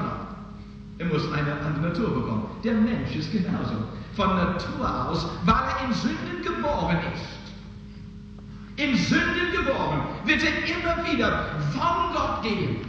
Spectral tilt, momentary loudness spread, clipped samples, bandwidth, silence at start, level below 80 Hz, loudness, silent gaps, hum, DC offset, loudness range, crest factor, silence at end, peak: -6 dB/octave; 19 LU; under 0.1%; 8 kHz; 0 s; -42 dBFS; -25 LUFS; none; none; under 0.1%; 4 LU; 20 dB; 0 s; -6 dBFS